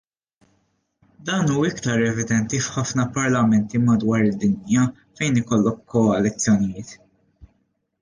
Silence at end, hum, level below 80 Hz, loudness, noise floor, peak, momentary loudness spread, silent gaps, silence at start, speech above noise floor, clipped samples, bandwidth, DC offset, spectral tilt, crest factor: 0.55 s; none; -52 dBFS; -21 LUFS; -69 dBFS; -8 dBFS; 6 LU; none; 1.2 s; 49 dB; under 0.1%; 10 kHz; under 0.1%; -5.5 dB/octave; 14 dB